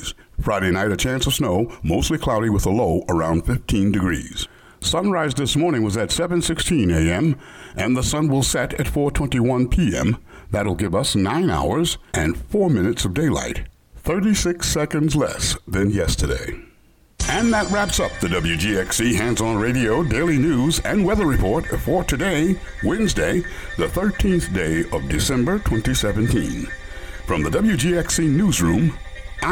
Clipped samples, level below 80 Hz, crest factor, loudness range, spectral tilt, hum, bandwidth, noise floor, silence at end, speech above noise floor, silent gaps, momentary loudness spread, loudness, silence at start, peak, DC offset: under 0.1%; -32 dBFS; 12 dB; 2 LU; -5 dB/octave; none; 19 kHz; -53 dBFS; 0 s; 34 dB; none; 7 LU; -20 LUFS; 0 s; -8 dBFS; under 0.1%